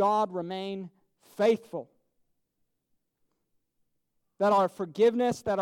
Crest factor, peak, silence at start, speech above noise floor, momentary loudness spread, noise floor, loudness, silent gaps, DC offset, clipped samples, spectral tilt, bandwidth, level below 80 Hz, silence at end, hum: 16 dB; -14 dBFS; 0 s; 51 dB; 16 LU; -78 dBFS; -27 LUFS; none; under 0.1%; under 0.1%; -6 dB/octave; 15 kHz; -70 dBFS; 0 s; none